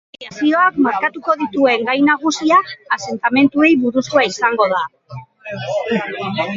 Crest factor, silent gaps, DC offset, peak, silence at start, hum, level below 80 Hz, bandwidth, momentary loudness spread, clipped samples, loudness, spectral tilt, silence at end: 16 dB; none; under 0.1%; 0 dBFS; 0.2 s; none; -60 dBFS; 7.6 kHz; 14 LU; under 0.1%; -16 LUFS; -4.5 dB/octave; 0 s